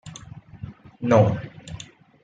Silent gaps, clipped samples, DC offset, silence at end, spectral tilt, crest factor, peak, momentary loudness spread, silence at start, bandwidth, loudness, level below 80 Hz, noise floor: none; under 0.1%; under 0.1%; 0.4 s; -7.5 dB/octave; 20 dB; -4 dBFS; 24 LU; 0.05 s; 7.8 kHz; -21 LUFS; -54 dBFS; -43 dBFS